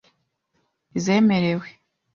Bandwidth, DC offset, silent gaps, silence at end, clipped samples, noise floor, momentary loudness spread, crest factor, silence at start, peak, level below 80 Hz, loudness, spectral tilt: 7.4 kHz; under 0.1%; none; 0.45 s; under 0.1%; -71 dBFS; 12 LU; 16 dB; 0.95 s; -8 dBFS; -62 dBFS; -21 LUFS; -6 dB/octave